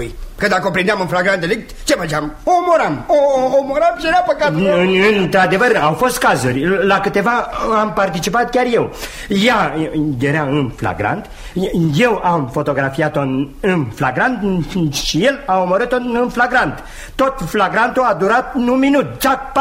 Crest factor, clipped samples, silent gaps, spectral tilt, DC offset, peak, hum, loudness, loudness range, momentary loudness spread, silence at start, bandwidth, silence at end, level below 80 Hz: 14 dB; under 0.1%; none; -5 dB/octave; under 0.1%; -2 dBFS; none; -15 LUFS; 4 LU; 7 LU; 0 s; 16 kHz; 0 s; -36 dBFS